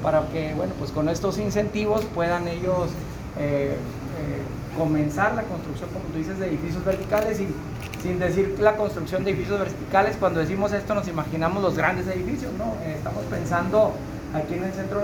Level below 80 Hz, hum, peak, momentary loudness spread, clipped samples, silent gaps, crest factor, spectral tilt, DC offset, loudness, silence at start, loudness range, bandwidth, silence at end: -42 dBFS; none; -4 dBFS; 9 LU; under 0.1%; none; 20 dB; -6.5 dB/octave; under 0.1%; -25 LUFS; 0 s; 3 LU; over 20 kHz; 0 s